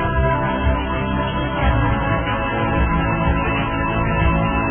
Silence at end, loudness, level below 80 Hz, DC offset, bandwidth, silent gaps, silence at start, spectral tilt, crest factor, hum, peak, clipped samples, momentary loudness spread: 0 s; -19 LUFS; -24 dBFS; under 0.1%; 3.5 kHz; none; 0 s; -11 dB/octave; 14 dB; none; -6 dBFS; under 0.1%; 3 LU